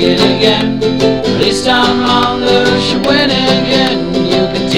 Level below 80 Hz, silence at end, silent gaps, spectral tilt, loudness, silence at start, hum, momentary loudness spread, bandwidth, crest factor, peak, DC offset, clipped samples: -36 dBFS; 0 s; none; -5 dB/octave; -11 LUFS; 0 s; none; 3 LU; 13.5 kHz; 10 dB; 0 dBFS; 2%; 0.3%